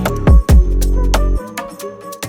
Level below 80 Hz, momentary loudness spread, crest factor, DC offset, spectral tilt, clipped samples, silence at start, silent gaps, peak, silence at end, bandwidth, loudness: -14 dBFS; 18 LU; 12 dB; under 0.1%; -6 dB/octave; under 0.1%; 0 s; none; 0 dBFS; 0 s; 16.5 kHz; -14 LUFS